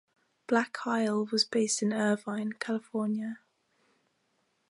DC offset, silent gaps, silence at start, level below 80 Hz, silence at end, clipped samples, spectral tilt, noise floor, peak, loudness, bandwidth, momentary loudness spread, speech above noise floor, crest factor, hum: under 0.1%; none; 0.5 s; -82 dBFS; 1.3 s; under 0.1%; -3.5 dB/octave; -75 dBFS; -12 dBFS; -30 LUFS; 11.5 kHz; 8 LU; 45 dB; 20 dB; none